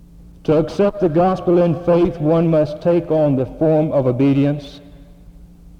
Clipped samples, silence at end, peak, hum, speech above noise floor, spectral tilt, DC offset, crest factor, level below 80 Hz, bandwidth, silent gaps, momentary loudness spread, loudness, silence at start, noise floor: under 0.1%; 0.75 s; -4 dBFS; none; 26 dB; -9.5 dB/octave; under 0.1%; 12 dB; -42 dBFS; 8.2 kHz; none; 3 LU; -17 LUFS; 0.45 s; -42 dBFS